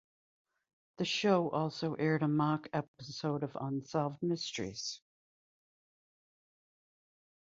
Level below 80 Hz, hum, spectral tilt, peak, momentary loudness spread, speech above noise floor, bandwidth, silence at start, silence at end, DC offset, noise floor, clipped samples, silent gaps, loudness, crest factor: -74 dBFS; none; -5 dB/octave; -16 dBFS; 9 LU; over 56 dB; 7.6 kHz; 1 s; 2.6 s; under 0.1%; under -90 dBFS; under 0.1%; 2.88-2.94 s; -35 LUFS; 22 dB